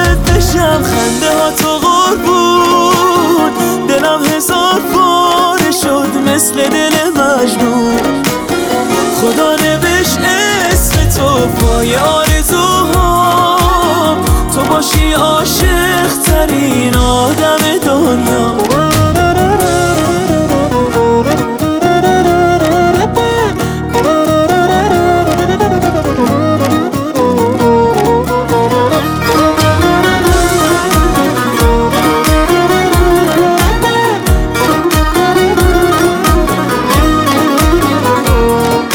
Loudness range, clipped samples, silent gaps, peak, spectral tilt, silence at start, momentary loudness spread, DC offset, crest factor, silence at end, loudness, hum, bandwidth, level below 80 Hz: 1 LU; under 0.1%; none; 0 dBFS; -4.5 dB/octave; 0 s; 3 LU; under 0.1%; 10 dB; 0 s; -10 LUFS; none; over 20 kHz; -20 dBFS